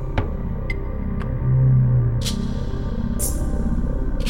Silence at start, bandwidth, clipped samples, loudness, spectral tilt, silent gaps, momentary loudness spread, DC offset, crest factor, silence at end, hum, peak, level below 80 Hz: 0 s; 16.5 kHz; under 0.1%; -23 LUFS; -6 dB/octave; none; 11 LU; 0.3%; 14 dB; 0 s; none; -8 dBFS; -24 dBFS